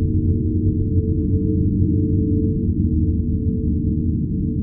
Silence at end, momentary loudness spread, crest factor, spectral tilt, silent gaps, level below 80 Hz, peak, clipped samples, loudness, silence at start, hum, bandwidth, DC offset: 0 s; 3 LU; 12 dB; -17 dB/octave; none; -26 dBFS; -6 dBFS; under 0.1%; -20 LUFS; 0 s; none; 0.6 kHz; under 0.1%